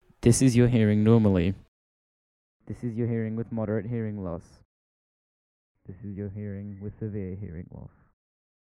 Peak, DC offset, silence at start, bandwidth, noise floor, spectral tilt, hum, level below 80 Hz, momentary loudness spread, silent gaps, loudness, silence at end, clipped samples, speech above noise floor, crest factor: -6 dBFS; under 0.1%; 0.2 s; 13 kHz; under -90 dBFS; -7 dB/octave; none; -50 dBFS; 20 LU; 1.68-2.60 s, 4.65-5.75 s; -26 LUFS; 0.8 s; under 0.1%; over 64 dB; 22 dB